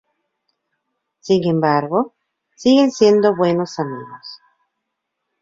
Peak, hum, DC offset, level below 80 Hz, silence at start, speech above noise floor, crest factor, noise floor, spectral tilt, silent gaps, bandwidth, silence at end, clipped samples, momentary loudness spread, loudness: -2 dBFS; none; under 0.1%; -60 dBFS; 1.25 s; 61 dB; 18 dB; -77 dBFS; -6 dB/octave; none; 7.8 kHz; 1.05 s; under 0.1%; 21 LU; -17 LUFS